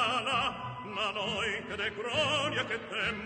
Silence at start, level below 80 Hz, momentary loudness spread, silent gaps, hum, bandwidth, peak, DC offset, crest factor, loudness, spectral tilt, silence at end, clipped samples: 0 s; -60 dBFS; 6 LU; none; none; 9.2 kHz; -18 dBFS; under 0.1%; 16 dB; -31 LUFS; -3 dB/octave; 0 s; under 0.1%